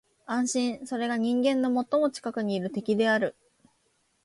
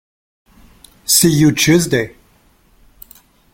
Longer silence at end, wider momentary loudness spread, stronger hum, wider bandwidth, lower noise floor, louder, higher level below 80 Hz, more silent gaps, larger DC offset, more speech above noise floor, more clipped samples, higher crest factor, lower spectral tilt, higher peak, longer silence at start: second, 0.95 s vs 1.45 s; second, 7 LU vs 15 LU; neither; second, 11.5 kHz vs 17 kHz; first, -71 dBFS vs -53 dBFS; second, -27 LUFS vs -12 LUFS; second, -74 dBFS vs -46 dBFS; neither; neither; first, 44 dB vs 40 dB; neither; about the same, 14 dB vs 18 dB; about the same, -4.5 dB/octave vs -4 dB/octave; second, -14 dBFS vs 0 dBFS; second, 0.3 s vs 1.1 s